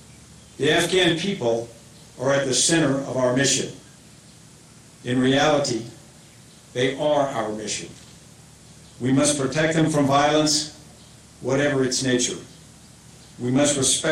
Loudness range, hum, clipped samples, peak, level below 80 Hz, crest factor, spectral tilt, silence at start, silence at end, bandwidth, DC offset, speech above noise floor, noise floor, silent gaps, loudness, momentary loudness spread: 4 LU; none; under 0.1%; -6 dBFS; -54 dBFS; 16 dB; -3.5 dB/octave; 0.3 s; 0 s; 16 kHz; under 0.1%; 27 dB; -48 dBFS; none; -21 LUFS; 12 LU